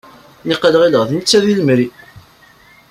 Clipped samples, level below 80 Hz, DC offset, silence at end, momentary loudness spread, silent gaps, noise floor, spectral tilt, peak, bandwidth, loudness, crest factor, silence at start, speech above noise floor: under 0.1%; -54 dBFS; under 0.1%; 0.7 s; 10 LU; none; -46 dBFS; -4.5 dB/octave; 0 dBFS; 15 kHz; -13 LUFS; 16 dB; 0.45 s; 33 dB